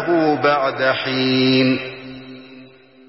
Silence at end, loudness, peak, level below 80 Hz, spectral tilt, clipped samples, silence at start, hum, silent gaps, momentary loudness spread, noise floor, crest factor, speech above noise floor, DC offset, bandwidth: 0.45 s; -17 LUFS; -4 dBFS; -60 dBFS; -9 dB/octave; under 0.1%; 0 s; none; none; 21 LU; -44 dBFS; 14 dB; 27 dB; 0.1%; 5.8 kHz